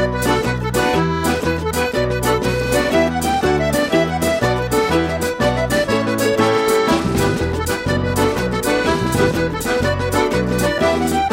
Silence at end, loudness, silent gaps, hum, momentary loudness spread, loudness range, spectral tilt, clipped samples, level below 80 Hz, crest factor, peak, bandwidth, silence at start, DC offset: 0 s; -17 LUFS; none; none; 3 LU; 1 LU; -5 dB/octave; under 0.1%; -32 dBFS; 14 dB; -4 dBFS; 16.5 kHz; 0 s; under 0.1%